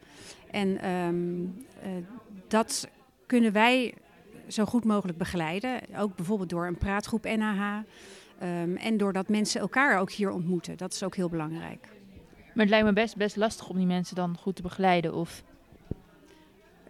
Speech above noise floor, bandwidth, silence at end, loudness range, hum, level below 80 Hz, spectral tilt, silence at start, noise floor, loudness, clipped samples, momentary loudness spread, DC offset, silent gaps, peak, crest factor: 29 dB; 15 kHz; 0.95 s; 4 LU; none; -54 dBFS; -5 dB/octave; 0.15 s; -57 dBFS; -29 LUFS; under 0.1%; 18 LU; under 0.1%; none; -8 dBFS; 20 dB